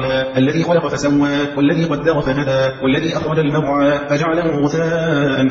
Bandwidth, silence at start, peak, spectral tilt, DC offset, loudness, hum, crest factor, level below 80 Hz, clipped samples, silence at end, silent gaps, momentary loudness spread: 7.8 kHz; 0 s; -2 dBFS; -6.5 dB/octave; under 0.1%; -16 LUFS; none; 14 dB; -42 dBFS; under 0.1%; 0 s; none; 2 LU